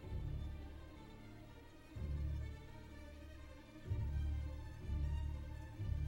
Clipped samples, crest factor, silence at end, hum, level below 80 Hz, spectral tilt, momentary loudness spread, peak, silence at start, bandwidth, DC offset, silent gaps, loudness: under 0.1%; 16 dB; 0 s; none; -46 dBFS; -7.5 dB/octave; 14 LU; -30 dBFS; 0 s; 16.5 kHz; under 0.1%; none; -47 LUFS